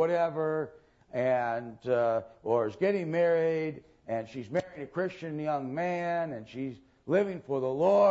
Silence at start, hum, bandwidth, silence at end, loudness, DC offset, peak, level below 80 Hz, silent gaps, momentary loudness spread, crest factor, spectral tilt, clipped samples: 0 s; none; 7.8 kHz; 0 s; -31 LUFS; under 0.1%; -14 dBFS; -70 dBFS; none; 11 LU; 16 dB; -7.5 dB/octave; under 0.1%